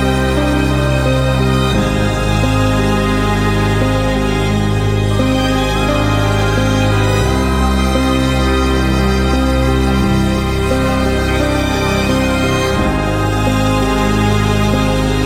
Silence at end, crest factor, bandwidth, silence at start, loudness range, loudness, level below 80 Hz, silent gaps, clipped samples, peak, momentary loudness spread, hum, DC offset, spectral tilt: 0 s; 14 dB; 16 kHz; 0 s; 1 LU; -14 LUFS; -20 dBFS; none; under 0.1%; 0 dBFS; 1 LU; none; under 0.1%; -6 dB/octave